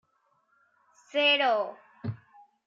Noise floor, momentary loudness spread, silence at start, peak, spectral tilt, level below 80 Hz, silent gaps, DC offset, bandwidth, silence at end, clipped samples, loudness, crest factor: -71 dBFS; 18 LU; 1.15 s; -14 dBFS; -5 dB/octave; -76 dBFS; none; under 0.1%; 7.6 kHz; 0.5 s; under 0.1%; -25 LUFS; 18 dB